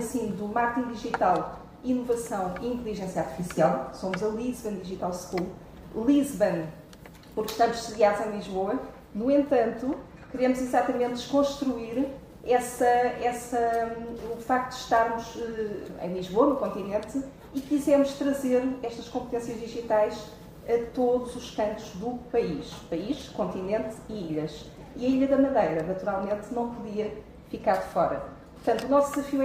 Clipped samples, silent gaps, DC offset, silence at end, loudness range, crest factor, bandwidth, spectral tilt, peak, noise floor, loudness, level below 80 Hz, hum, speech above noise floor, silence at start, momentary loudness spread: under 0.1%; none; under 0.1%; 0 s; 3 LU; 18 dB; 15.5 kHz; -5.5 dB/octave; -8 dBFS; -48 dBFS; -28 LUFS; -54 dBFS; none; 20 dB; 0 s; 12 LU